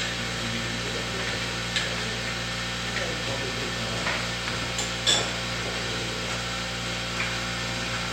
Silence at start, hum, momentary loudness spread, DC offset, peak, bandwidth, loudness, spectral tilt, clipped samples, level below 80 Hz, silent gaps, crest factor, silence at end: 0 s; 60 Hz at -55 dBFS; 4 LU; under 0.1%; -8 dBFS; 16.5 kHz; -27 LUFS; -2.5 dB/octave; under 0.1%; -44 dBFS; none; 22 dB; 0 s